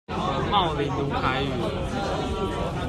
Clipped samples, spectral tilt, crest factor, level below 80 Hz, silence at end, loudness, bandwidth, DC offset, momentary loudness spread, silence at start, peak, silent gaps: under 0.1%; -6 dB/octave; 16 dB; -38 dBFS; 0 s; -26 LUFS; 13 kHz; under 0.1%; 5 LU; 0.1 s; -8 dBFS; none